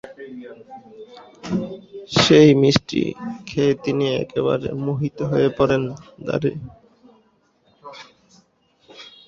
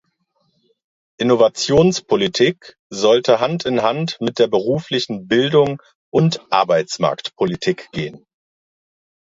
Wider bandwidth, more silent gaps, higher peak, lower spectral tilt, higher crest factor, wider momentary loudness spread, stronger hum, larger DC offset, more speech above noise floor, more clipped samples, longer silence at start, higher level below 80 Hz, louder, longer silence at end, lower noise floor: about the same, 7.8 kHz vs 8 kHz; second, none vs 2.79-2.90 s, 5.95-6.12 s; about the same, 0 dBFS vs 0 dBFS; about the same, -6 dB/octave vs -5 dB/octave; about the same, 20 dB vs 18 dB; first, 27 LU vs 8 LU; neither; neither; second, 41 dB vs 49 dB; neither; second, 0.05 s vs 1.2 s; about the same, -52 dBFS vs -54 dBFS; about the same, -19 LUFS vs -17 LUFS; second, 0.25 s vs 1.05 s; second, -61 dBFS vs -66 dBFS